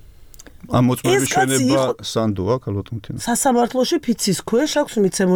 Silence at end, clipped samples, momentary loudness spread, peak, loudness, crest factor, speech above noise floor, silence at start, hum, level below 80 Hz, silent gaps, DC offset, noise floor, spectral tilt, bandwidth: 0 s; under 0.1%; 6 LU; -6 dBFS; -19 LUFS; 12 dB; 23 dB; 0.2 s; none; -48 dBFS; none; under 0.1%; -42 dBFS; -4.5 dB/octave; 19.5 kHz